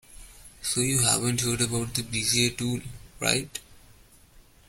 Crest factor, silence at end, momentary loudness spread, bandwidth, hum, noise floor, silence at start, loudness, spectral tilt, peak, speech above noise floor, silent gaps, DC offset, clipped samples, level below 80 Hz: 22 dB; 0.3 s; 13 LU; 16.5 kHz; none; -55 dBFS; 0.1 s; -25 LUFS; -3 dB/octave; -6 dBFS; 28 dB; none; under 0.1%; under 0.1%; -50 dBFS